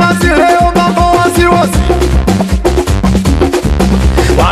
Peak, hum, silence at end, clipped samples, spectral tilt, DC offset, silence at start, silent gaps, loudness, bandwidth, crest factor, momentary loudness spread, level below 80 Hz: 0 dBFS; none; 0 s; 0.4%; -6 dB/octave; under 0.1%; 0 s; none; -9 LUFS; 14.5 kHz; 8 dB; 3 LU; -14 dBFS